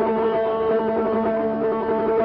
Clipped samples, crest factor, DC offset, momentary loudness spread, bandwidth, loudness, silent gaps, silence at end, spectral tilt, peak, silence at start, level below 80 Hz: under 0.1%; 10 dB; under 0.1%; 1 LU; 5.2 kHz; -22 LUFS; none; 0 s; -5.5 dB/octave; -12 dBFS; 0 s; -52 dBFS